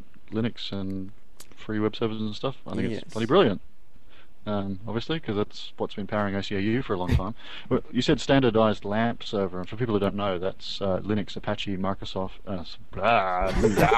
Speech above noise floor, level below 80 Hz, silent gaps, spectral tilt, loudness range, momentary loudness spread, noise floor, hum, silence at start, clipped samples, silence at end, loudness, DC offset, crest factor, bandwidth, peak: 28 dB; -42 dBFS; none; -6.5 dB/octave; 4 LU; 12 LU; -54 dBFS; none; 0.3 s; under 0.1%; 0 s; -27 LUFS; 2%; 20 dB; 14 kHz; -6 dBFS